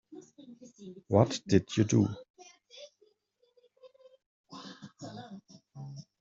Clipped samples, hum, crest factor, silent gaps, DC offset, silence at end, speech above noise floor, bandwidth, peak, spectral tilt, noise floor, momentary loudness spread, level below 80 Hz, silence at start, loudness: under 0.1%; none; 26 dB; 2.30-2.34 s, 4.26-4.44 s; under 0.1%; 0.2 s; 45 dB; 7.8 kHz; -8 dBFS; -7 dB/octave; -72 dBFS; 26 LU; -68 dBFS; 0.1 s; -28 LUFS